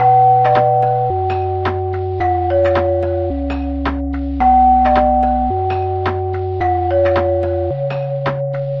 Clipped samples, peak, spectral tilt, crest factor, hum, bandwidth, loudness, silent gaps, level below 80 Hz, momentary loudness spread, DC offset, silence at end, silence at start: under 0.1%; -2 dBFS; -9.5 dB/octave; 14 dB; none; 5.8 kHz; -16 LUFS; none; -30 dBFS; 9 LU; 0.4%; 0 s; 0 s